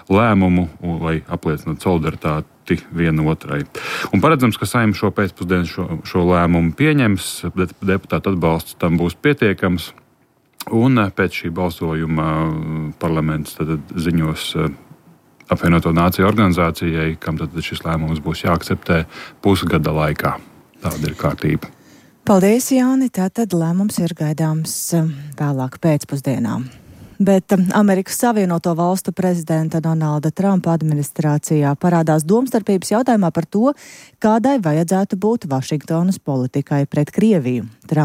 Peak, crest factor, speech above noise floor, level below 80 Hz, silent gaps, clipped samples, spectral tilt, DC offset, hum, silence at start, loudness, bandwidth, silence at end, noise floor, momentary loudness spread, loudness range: -2 dBFS; 14 dB; 40 dB; -40 dBFS; none; under 0.1%; -6.5 dB/octave; under 0.1%; none; 0.1 s; -18 LUFS; 16 kHz; 0 s; -57 dBFS; 9 LU; 3 LU